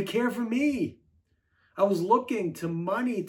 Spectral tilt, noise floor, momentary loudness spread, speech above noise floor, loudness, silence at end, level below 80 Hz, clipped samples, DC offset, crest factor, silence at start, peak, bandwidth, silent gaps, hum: -6.5 dB/octave; -69 dBFS; 7 LU; 42 dB; -28 LUFS; 0 s; -68 dBFS; under 0.1%; under 0.1%; 18 dB; 0 s; -10 dBFS; 17.5 kHz; none; none